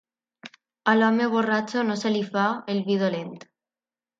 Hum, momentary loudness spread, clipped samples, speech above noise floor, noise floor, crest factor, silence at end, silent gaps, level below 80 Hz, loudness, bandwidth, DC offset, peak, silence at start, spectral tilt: none; 8 LU; under 0.1%; over 67 dB; under -90 dBFS; 18 dB; 0.8 s; none; -74 dBFS; -24 LUFS; 7.6 kHz; under 0.1%; -6 dBFS; 0.45 s; -6 dB/octave